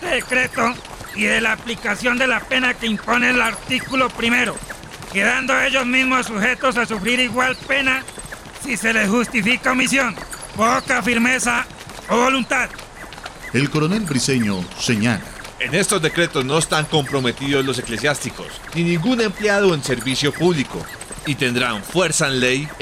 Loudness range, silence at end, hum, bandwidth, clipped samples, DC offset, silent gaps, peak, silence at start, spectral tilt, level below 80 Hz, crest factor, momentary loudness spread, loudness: 2 LU; 0 s; none; 16 kHz; under 0.1%; under 0.1%; none; -4 dBFS; 0 s; -3.5 dB/octave; -44 dBFS; 16 dB; 12 LU; -18 LUFS